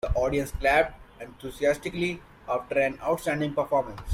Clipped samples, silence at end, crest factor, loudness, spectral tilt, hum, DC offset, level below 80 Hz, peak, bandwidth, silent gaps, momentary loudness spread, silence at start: under 0.1%; 0 s; 18 dB; -27 LUFS; -5.5 dB/octave; none; under 0.1%; -40 dBFS; -8 dBFS; 16.5 kHz; none; 16 LU; 0.05 s